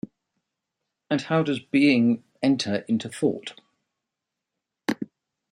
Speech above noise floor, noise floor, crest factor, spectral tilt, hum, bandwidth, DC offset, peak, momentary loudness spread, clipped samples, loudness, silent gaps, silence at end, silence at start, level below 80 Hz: 62 dB; -85 dBFS; 20 dB; -6 dB/octave; none; 11.5 kHz; under 0.1%; -6 dBFS; 15 LU; under 0.1%; -24 LUFS; none; 0.45 s; 1.1 s; -70 dBFS